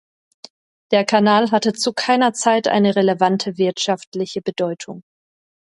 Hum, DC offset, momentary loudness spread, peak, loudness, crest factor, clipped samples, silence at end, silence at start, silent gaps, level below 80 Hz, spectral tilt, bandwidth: none; under 0.1%; 10 LU; -2 dBFS; -18 LUFS; 18 dB; under 0.1%; 0.75 s; 0.9 s; 4.07-4.12 s; -66 dBFS; -4.5 dB/octave; 11.5 kHz